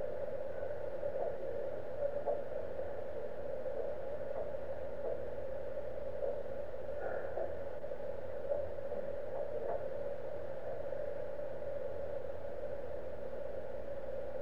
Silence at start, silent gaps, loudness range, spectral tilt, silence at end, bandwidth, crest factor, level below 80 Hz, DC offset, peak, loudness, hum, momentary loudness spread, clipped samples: 0 s; none; 2 LU; -7.5 dB/octave; 0 s; 7.6 kHz; 16 dB; -60 dBFS; 1%; -24 dBFS; -42 LUFS; 60 Hz at -60 dBFS; 4 LU; under 0.1%